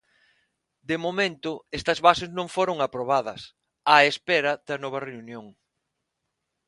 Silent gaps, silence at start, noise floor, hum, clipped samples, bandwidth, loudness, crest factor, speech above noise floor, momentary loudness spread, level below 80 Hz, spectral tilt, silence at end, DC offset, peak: none; 0.9 s; -81 dBFS; none; under 0.1%; 11.5 kHz; -24 LUFS; 26 dB; 56 dB; 20 LU; -60 dBFS; -4 dB/octave; 1.15 s; under 0.1%; 0 dBFS